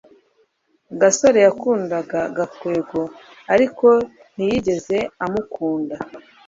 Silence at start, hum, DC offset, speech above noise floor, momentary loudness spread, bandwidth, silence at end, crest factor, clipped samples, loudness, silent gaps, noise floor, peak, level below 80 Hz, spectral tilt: 0.9 s; none; under 0.1%; 45 dB; 14 LU; 7.8 kHz; 0.25 s; 18 dB; under 0.1%; -19 LUFS; none; -63 dBFS; -2 dBFS; -54 dBFS; -4.5 dB/octave